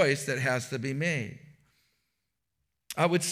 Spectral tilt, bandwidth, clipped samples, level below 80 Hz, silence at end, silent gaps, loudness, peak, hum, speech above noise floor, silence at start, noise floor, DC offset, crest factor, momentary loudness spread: -4.5 dB/octave; 16 kHz; under 0.1%; -74 dBFS; 0 s; none; -29 LUFS; -12 dBFS; none; 54 dB; 0 s; -83 dBFS; under 0.1%; 20 dB; 10 LU